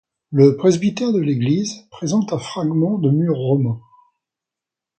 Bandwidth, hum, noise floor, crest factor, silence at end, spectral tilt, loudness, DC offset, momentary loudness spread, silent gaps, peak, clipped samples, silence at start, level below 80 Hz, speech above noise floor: 9 kHz; none; -87 dBFS; 18 dB; 1.2 s; -7 dB/octave; -18 LUFS; under 0.1%; 10 LU; none; -2 dBFS; under 0.1%; 0.3 s; -60 dBFS; 69 dB